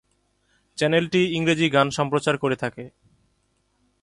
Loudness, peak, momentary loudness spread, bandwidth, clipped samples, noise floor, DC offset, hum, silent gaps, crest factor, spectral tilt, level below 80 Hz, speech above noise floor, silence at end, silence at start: -22 LUFS; -6 dBFS; 17 LU; 11.5 kHz; under 0.1%; -68 dBFS; under 0.1%; none; none; 18 dB; -5 dB/octave; -60 dBFS; 47 dB; 1.15 s; 0.75 s